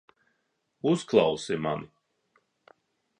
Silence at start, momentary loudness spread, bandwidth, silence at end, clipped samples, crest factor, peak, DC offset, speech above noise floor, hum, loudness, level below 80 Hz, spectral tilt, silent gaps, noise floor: 0.85 s; 9 LU; 10 kHz; 1.35 s; under 0.1%; 22 dB; -8 dBFS; under 0.1%; 51 dB; none; -27 LUFS; -66 dBFS; -5.5 dB/octave; none; -77 dBFS